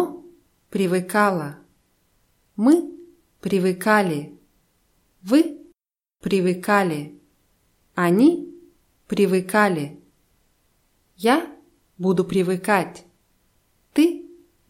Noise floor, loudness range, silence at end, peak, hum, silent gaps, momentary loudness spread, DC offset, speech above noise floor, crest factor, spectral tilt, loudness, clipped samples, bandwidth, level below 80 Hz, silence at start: -74 dBFS; 2 LU; 0.45 s; -4 dBFS; none; none; 17 LU; under 0.1%; 55 dB; 20 dB; -6 dB/octave; -21 LUFS; under 0.1%; 16.5 kHz; -62 dBFS; 0 s